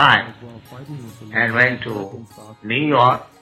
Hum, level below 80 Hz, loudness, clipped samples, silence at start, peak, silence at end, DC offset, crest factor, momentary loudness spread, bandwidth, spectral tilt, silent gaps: none; -56 dBFS; -17 LUFS; under 0.1%; 0 s; 0 dBFS; 0.2 s; under 0.1%; 18 dB; 23 LU; 15.5 kHz; -6 dB/octave; none